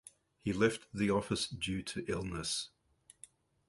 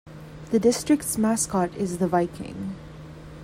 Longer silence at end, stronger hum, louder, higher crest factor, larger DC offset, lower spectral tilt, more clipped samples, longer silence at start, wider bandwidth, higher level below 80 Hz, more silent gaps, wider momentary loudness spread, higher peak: first, 1 s vs 0 s; neither; second, -36 LUFS vs -24 LUFS; first, 22 dB vs 16 dB; neither; about the same, -4.5 dB/octave vs -5 dB/octave; neither; first, 0.45 s vs 0.05 s; second, 11.5 kHz vs 16 kHz; second, -58 dBFS vs -50 dBFS; neither; second, 17 LU vs 20 LU; second, -16 dBFS vs -8 dBFS